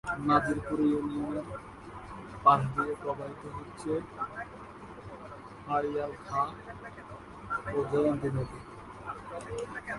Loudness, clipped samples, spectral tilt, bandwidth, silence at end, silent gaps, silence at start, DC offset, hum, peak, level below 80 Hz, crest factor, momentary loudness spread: -31 LUFS; under 0.1%; -7 dB/octave; 11.5 kHz; 0 s; none; 0.05 s; under 0.1%; none; -8 dBFS; -56 dBFS; 24 dB; 19 LU